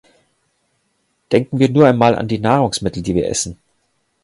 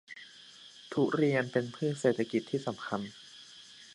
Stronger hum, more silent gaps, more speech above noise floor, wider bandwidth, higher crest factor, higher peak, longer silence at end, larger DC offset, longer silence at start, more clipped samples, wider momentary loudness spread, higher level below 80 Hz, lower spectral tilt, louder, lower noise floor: neither; neither; first, 51 dB vs 23 dB; about the same, 11.5 kHz vs 11.5 kHz; about the same, 18 dB vs 20 dB; first, 0 dBFS vs -14 dBFS; first, 0.7 s vs 0 s; neither; first, 1.3 s vs 0.1 s; neither; second, 9 LU vs 21 LU; first, -44 dBFS vs -76 dBFS; about the same, -5.5 dB/octave vs -6 dB/octave; first, -16 LUFS vs -32 LUFS; first, -66 dBFS vs -54 dBFS